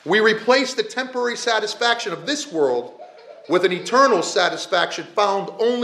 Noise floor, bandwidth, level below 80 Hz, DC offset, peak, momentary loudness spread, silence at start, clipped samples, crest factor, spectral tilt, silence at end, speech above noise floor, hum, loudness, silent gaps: -41 dBFS; 12.5 kHz; -80 dBFS; under 0.1%; -2 dBFS; 8 LU; 0.05 s; under 0.1%; 18 dB; -3 dB/octave; 0 s; 22 dB; none; -20 LUFS; none